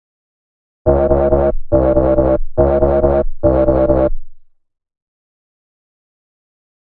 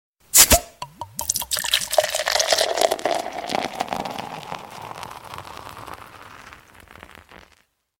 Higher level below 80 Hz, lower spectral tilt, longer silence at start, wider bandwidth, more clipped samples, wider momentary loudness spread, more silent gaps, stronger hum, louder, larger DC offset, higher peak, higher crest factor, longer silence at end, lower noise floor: first, -24 dBFS vs -42 dBFS; first, -14 dB/octave vs -1 dB/octave; first, 0.85 s vs 0.35 s; second, 3.8 kHz vs 17 kHz; neither; second, 3 LU vs 24 LU; neither; neither; first, -14 LUFS vs -19 LUFS; neither; about the same, 0 dBFS vs 0 dBFS; second, 14 dB vs 24 dB; first, 2.4 s vs 0.6 s; second, -36 dBFS vs -61 dBFS